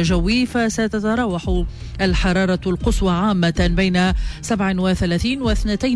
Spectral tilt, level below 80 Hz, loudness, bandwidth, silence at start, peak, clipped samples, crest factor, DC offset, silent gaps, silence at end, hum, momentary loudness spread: -5.5 dB/octave; -26 dBFS; -19 LUFS; 11 kHz; 0 s; -8 dBFS; under 0.1%; 10 dB; under 0.1%; none; 0 s; none; 5 LU